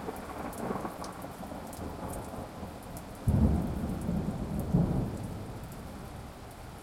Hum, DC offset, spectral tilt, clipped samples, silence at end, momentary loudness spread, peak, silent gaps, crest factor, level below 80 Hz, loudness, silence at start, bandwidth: none; under 0.1%; -7.5 dB/octave; under 0.1%; 0 s; 15 LU; -12 dBFS; none; 22 dB; -42 dBFS; -35 LUFS; 0 s; 16.5 kHz